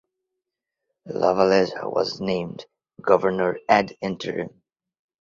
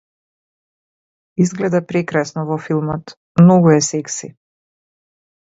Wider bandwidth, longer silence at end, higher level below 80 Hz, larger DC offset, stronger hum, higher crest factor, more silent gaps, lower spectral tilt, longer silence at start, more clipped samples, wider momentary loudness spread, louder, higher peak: about the same, 7.6 kHz vs 8 kHz; second, 0.75 s vs 1.3 s; about the same, -60 dBFS vs -56 dBFS; neither; neither; about the same, 22 dB vs 18 dB; second, none vs 3.17-3.35 s; about the same, -6 dB/octave vs -6 dB/octave; second, 1.05 s vs 1.4 s; neither; about the same, 14 LU vs 15 LU; second, -22 LUFS vs -16 LUFS; about the same, -2 dBFS vs 0 dBFS